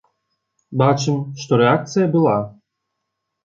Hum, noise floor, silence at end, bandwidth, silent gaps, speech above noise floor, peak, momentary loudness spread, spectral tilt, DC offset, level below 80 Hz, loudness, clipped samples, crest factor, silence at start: none; -77 dBFS; 0.95 s; 7.6 kHz; none; 61 dB; -2 dBFS; 9 LU; -6.5 dB/octave; under 0.1%; -60 dBFS; -18 LUFS; under 0.1%; 18 dB; 0.7 s